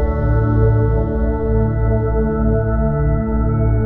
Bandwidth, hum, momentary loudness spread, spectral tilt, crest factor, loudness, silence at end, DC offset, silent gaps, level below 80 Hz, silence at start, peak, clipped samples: 2.3 kHz; none; 3 LU; -13 dB/octave; 12 dB; -17 LUFS; 0 s; under 0.1%; none; -20 dBFS; 0 s; -4 dBFS; under 0.1%